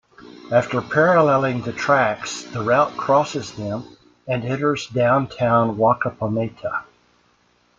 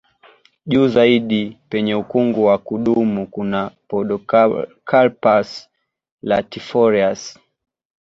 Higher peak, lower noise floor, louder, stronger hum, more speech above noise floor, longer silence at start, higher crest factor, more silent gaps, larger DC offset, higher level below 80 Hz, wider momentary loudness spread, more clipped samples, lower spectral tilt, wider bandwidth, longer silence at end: about the same, -4 dBFS vs -2 dBFS; first, -61 dBFS vs -51 dBFS; second, -20 LUFS vs -17 LUFS; neither; first, 41 dB vs 35 dB; second, 0.2 s vs 0.65 s; about the same, 18 dB vs 16 dB; second, none vs 6.12-6.18 s; neither; about the same, -56 dBFS vs -56 dBFS; about the same, 12 LU vs 10 LU; neither; about the same, -6 dB/octave vs -6.5 dB/octave; about the same, 7.8 kHz vs 7.8 kHz; first, 0.95 s vs 0.7 s